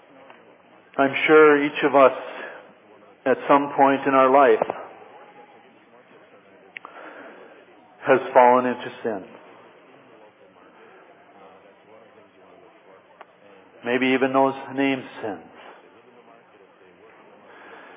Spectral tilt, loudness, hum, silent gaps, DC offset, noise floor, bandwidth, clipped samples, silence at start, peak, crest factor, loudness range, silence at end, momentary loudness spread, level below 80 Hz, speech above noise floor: -9 dB/octave; -19 LUFS; none; none; under 0.1%; -52 dBFS; 3.9 kHz; under 0.1%; 0.95 s; -2 dBFS; 22 dB; 13 LU; 2.55 s; 24 LU; -80 dBFS; 33 dB